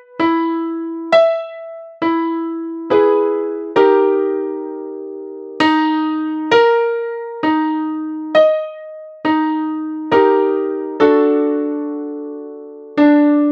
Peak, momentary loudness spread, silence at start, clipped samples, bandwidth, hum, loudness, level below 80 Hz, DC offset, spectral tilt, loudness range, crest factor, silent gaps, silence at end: 0 dBFS; 16 LU; 0.15 s; under 0.1%; 7.2 kHz; none; -16 LUFS; -64 dBFS; under 0.1%; -6 dB/octave; 1 LU; 16 dB; none; 0 s